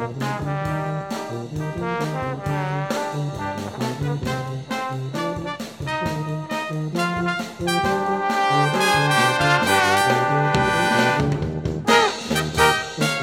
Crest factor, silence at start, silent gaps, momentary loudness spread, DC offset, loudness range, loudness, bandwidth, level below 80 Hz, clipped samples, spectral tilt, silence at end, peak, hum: 20 dB; 0 s; none; 11 LU; under 0.1%; 8 LU; -21 LUFS; 17 kHz; -44 dBFS; under 0.1%; -4.5 dB/octave; 0 s; 0 dBFS; none